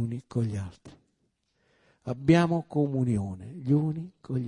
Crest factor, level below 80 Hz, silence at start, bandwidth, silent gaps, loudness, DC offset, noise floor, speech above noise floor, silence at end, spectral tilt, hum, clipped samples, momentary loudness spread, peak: 20 dB; -60 dBFS; 0 s; 10.5 kHz; none; -28 LUFS; under 0.1%; -75 dBFS; 47 dB; 0 s; -8 dB/octave; none; under 0.1%; 15 LU; -8 dBFS